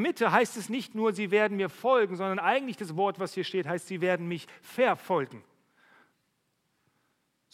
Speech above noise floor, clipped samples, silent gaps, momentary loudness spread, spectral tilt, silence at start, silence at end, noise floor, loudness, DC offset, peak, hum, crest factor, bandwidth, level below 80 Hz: 47 dB; under 0.1%; none; 9 LU; -5 dB/octave; 0 s; 2.15 s; -76 dBFS; -29 LUFS; under 0.1%; -8 dBFS; none; 22 dB; 15.5 kHz; -82 dBFS